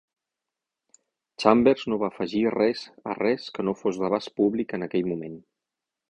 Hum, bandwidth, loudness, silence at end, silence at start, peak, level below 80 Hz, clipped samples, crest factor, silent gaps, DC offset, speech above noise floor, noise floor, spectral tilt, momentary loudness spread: none; 10 kHz; -25 LUFS; 0.7 s; 1.4 s; -2 dBFS; -62 dBFS; under 0.1%; 26 dB; none; under 0.1%; 63 dB; -87 dBFS; -6.5 dB/octave; 13 LU